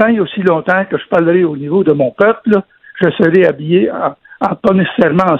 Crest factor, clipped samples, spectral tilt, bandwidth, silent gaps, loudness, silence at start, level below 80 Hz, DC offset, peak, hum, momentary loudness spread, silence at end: 12 dB; under 0.1%; -9 dB/octave; 6 kHz; none; -13 LUFS; 0 s; -52 dBFS; under 0.1%; 0 dBFS; none; 6 LU; 0 s